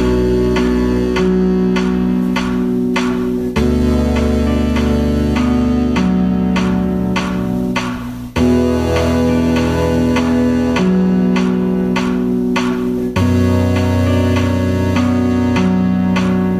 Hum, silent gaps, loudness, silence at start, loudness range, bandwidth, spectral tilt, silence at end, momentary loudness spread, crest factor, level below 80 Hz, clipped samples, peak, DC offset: none; none; -15 LUFS; 0 s; 2 LU; 14 kHz; -7 dB/octave; 0 s; 3 LU; 12 dB; -26 dBFS; under 0.1%; -2 dBFS; under 0.1%